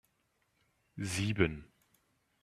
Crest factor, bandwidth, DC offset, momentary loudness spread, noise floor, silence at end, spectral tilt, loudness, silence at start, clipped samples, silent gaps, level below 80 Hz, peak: 26 dB; 14 kHz; under 0.1%; 18 LU; -77 dBFS; 0.8 s; -5 dB/octave; -34 LUFS; 0.95 s; under 0.1%; none; -58 dBFS; -12 dBFS